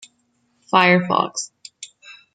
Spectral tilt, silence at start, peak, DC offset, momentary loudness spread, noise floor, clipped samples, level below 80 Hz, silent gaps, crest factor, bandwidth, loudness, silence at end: -4 dB/octave; 0.75 s; -2 dBFS; under 0.1%; 23 LU; -66 dBFS; under 0.1%; -68 dBFS; none; 20 dB; 9.4 kHz; -17 LUFS; 0.25 s